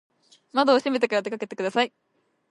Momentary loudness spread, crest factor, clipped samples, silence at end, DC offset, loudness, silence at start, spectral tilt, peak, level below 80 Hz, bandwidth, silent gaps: 9 LU; 20 dB; under 0.1%; 0.65 s; under 0.1%; -24 LUFS; 0.55 s; -4 dB/octave; -6 dBFS; -80 dBFS; 11.5 kHz; none